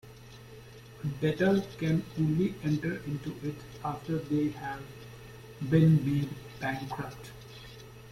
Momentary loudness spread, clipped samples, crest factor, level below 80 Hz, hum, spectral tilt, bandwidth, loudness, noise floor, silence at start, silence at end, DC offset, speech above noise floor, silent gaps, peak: 22 LU; under 0.1%; 20 dB; -56 dBFS; none; -7.5 dB/octave; 15.5 kHz; -31 LUFS; -49 dBFS; 0.05 s; 0 s; under 0.1%; 20 dB; none; -12 dBFS